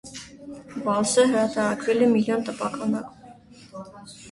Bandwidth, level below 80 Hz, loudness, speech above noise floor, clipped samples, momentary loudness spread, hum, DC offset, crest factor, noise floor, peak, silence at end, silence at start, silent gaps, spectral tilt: 11.5 kHz; -62 dBFS; -23 LUFS; 25 dB; under 0.1%; 22 LU; none; under 0.1%; 18 dB; -48 dBFS; -6 dBFS; 0 s; 0.05 s; none; -4.5 dB/octave